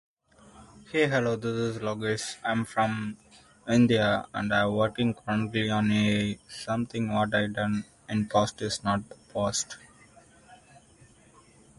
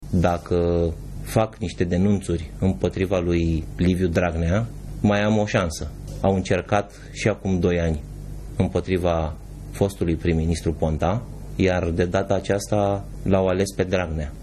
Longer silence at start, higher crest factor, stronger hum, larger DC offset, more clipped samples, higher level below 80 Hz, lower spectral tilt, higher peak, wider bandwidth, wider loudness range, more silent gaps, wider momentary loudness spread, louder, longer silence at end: first, 0.55 s vs 0 s; about the same, 18 dB vs 16 dB; neither; neither; neither; second, -58 dBFS vs -38 dBFS; second, -5 dB/octave vs -6.5 dB/octave; second, -10 dBFS vs -6 dBFS; second, 11.5 kHz vs 13.5 kHz; first, 5 LU vs 2 LU; neither; about the same, 9 LU vs 8 LU; second, -28 LUFS vs -23 LUFS; first, 1.25 s vs 0 s